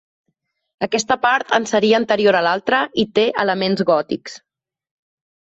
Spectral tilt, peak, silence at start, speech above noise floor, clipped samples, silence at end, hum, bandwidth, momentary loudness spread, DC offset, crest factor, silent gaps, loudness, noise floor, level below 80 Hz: -4 dB/octave; -2 dBFS; 0.8 s; 55 dB; under 0.1%; 1.1 s; none; 8 kHz; 8 LU; under 0.1%; 16 dB; none; -17 LUFS; -72 dBFS; -60 dBFS